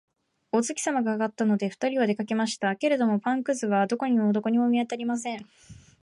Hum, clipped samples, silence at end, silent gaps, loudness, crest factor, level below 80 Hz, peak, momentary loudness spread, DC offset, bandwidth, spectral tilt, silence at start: none; under 0.1%; 0.3 s; none; -26 LUFS; 14 dB; -70 dBFS; -12 dBFS; 5 LU; under 0.1%; 11.5 kHz; -5 dB/octave; 0.55 s